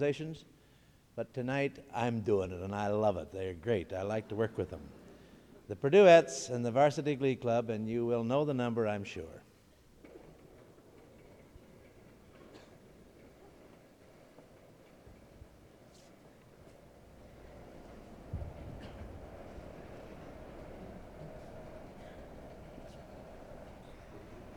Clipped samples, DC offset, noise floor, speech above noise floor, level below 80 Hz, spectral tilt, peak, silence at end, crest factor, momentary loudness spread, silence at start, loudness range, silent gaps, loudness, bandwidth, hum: under 0.1%; under 0.1%; -63 dBFS; 32 dB; -58 dBFS; -6 dB/octave; -12 dBFS; 0 s; 24 dB; 24 LU; 0 s; 22 LU; none; -31 LUFS; 13 kHz; none